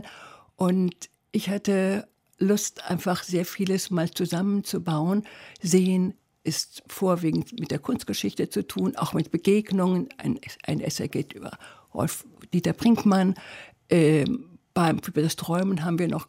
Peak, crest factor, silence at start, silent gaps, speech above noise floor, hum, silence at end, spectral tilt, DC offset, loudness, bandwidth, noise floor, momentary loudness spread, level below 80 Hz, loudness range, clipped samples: -8 dBFS; 16 dB; 0 s; none; 23 dB; none; 0.05 s; -6 dB/octave; under 0.1%; -26 LUFS; 16 kHz; -48 dBFS; 12 LU; -62 dBFS; 4 LU; under 0.1%